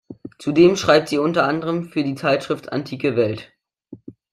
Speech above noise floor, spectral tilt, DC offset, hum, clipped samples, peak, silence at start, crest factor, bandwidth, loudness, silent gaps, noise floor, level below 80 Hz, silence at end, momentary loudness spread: 25 dB; -5.5 dB/octave; under 0.1%; none; under 0.1%; -2 dBFS; 0.1 s; 18 dB; 12.5 kHz; -19 LUFS; none; -44 dBFS; -58 dBFS; 0.2 s; 12 LU